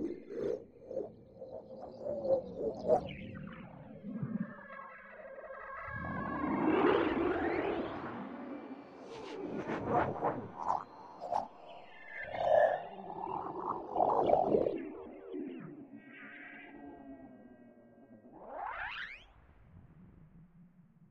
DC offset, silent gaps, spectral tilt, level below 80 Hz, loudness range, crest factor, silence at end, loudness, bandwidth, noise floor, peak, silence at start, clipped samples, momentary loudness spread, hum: under 0.1%; none; -7.5 dB/octave; -64 dBFS; 14 LU; 24 dB; 0.05 s; -36 LUFS; 7.8 kHz; -62 dBFS; -14 dBFS; 0 s; under 0.1%; 21 LU; none